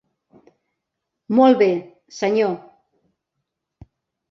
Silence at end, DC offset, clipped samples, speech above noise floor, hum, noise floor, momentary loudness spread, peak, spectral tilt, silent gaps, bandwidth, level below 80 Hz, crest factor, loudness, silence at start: 1.7 s; under 0.1%; under 0.1%; 64 dB; none; -80 dBFS; 16 LU; -2 dBFS; -6 dB/octave; none; 7.4 kHz; -64 dBFS; 20 dB; -18 LUFS; 1.3 s